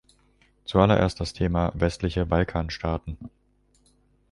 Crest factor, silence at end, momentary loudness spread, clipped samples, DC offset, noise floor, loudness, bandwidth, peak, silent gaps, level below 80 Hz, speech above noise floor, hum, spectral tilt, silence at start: 22 dB; 1.05 s; 19 LU; under 0.1%; under 0.1%; -63 dBFS; -25 LUFS; 11.5 kHz; -4 dBFS; none; -38 dBFS; 39 dB; 50 Hz at -50 dBFS; -7 dB/octave; 0.7 s